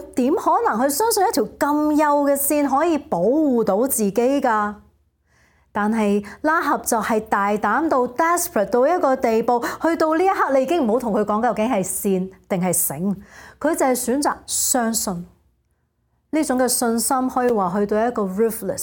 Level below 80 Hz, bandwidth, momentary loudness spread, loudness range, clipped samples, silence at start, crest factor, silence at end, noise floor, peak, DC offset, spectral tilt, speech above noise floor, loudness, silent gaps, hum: -54 dBFS; 17.5 kHz; 5 LU; 3 LU; under 0.1%; 0 s; 16 dB; 0 s; -67 dBFS; -4 dBFS; under 0.1%; -4 dB/octave; 48 dB; -20 LUFS; none; none